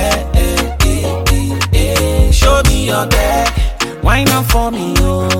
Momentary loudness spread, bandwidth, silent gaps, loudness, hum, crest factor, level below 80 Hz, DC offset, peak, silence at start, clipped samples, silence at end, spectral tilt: 5 LU; 17 kHz; none; -13 LUFS; none; 12 dB; -14 dBFS; under 0.1%; 0 dBFS; 0 s; under 0.1%; 0 s; -4.5 dB/octave